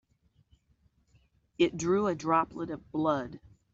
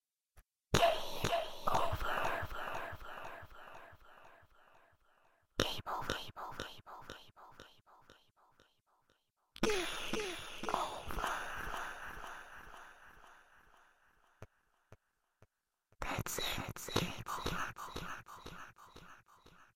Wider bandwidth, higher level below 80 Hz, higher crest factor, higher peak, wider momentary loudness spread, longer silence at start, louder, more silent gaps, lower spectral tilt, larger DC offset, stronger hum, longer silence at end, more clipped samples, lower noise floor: second, 7.8 kHz vs 16.5 kHz; second, -62 dBFS vs -54 dBFS; second, 20 dB vs 30 dB; about the same, -12 dBFS vs -12 dBFS; second, 11 LU vs 23 LU; first, 1.6 s vs 0.35 s; first, -30 LUFS vs -39 LUFS; neither; first, -5 dB/octave vs -3.5 dB/octave; neither; neither; first, 0.35 s vs 0.1 s; neither; second, -69 dBFS vs -78 dBFS